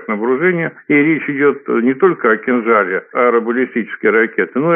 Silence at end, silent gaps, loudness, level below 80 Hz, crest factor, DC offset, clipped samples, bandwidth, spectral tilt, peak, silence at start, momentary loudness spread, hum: 0 s; none; -14 LUFS; -68 dBFS; 14 dB; under 0.1%; under 0.1%; 3.7 kHz; -11.5 dB/octave; 0 dBFS; 0 s; 5 LU; none